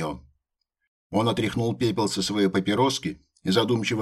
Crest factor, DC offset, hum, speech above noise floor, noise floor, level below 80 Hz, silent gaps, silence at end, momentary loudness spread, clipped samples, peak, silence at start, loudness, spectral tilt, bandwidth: 18 dB; under 0.1%; none; 56 dB; -79 dBFS; -56 dBFS; 0.87-1.10 s; 0 s; 11 LU; under 0.1%; -8 dBFS; 0 s; -25 LUFS; -5 dB/octave; 15 kHz